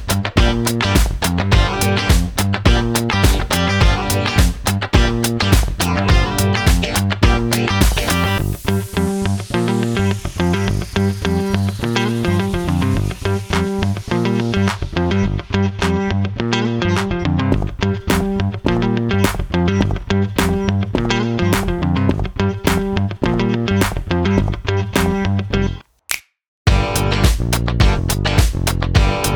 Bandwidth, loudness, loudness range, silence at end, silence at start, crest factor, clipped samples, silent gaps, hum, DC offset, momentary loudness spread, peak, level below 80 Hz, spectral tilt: over 20 kHz; -17 LUFS; 3 LU; 0 s; 0 s; 16 dB; under 0.1%; 26.48-26.65 s; none; under 0.1%; 4 LU; 0 dBFS; -24 dBFS; -5.5 dB/octave